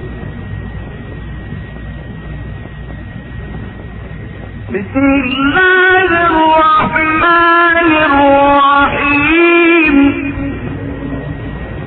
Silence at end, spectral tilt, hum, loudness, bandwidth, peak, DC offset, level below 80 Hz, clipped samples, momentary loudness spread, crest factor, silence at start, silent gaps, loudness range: 0 s; -9.5 dB/octave; none; -9 LUFS; 4.5 kHz; 0 dBFS; under 0.1%; -30 dBFS; under 0.1%; 20 LU; 12 dB; 0 s; none; 18 LU